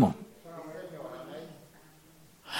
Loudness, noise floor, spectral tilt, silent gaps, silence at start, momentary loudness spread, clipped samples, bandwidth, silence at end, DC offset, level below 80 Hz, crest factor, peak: -39 LUFS; -58 dBFS; -6.5 dB/octave; none; 0 s; 14 LU; under 0.1%; 16.5 kHz; 0 s; under 0.1%; -68 dBFS; 26 dB; -10 dBFS